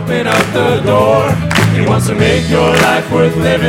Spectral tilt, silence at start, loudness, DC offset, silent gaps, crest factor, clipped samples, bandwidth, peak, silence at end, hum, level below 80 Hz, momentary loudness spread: -5.5 dB/octave; 0 s; -11 LUFS; under 0.1%; none; 10 dB; under 0.1%; 16.5 kHz; 0 dBFS; 0 s; none; -32 dBFS; 3 LU